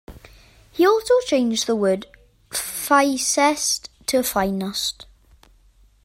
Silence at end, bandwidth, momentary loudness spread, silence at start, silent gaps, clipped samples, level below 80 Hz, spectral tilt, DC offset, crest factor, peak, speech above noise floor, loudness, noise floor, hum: 1 s; 16 kHz; 9 LU; 0.1 s; none; under 0.1%; -52 dBFS; -3 dB/octave; under 0.1%; 18 dB; -4 dBFS; 35 dB; -20 LUFS; -55 dBFS; none